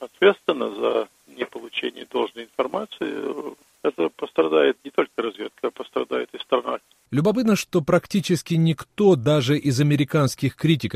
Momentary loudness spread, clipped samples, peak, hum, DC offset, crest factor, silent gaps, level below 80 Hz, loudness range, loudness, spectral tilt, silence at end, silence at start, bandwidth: 11 LU; under 0.1%; -4 dBFS; none; under 0.1%; 18 dB; none; -60 dBFS; 7 LU; -23 LUFS; -6 dB/octave; 0.05 s; 0 s; 15 kHz